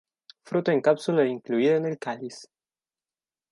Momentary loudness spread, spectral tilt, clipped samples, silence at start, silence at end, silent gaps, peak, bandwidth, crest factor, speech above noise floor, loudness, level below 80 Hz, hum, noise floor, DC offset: 13 LU; -6.5 dB/octave; under 0.1%; 0.5 s; 1.1 s; none; -8 dBFS; 11.5 kHz; 18 dB; over 66 dB; -25 LUFS; -78 dBFS; none; under -90 dBFS; under 0.1%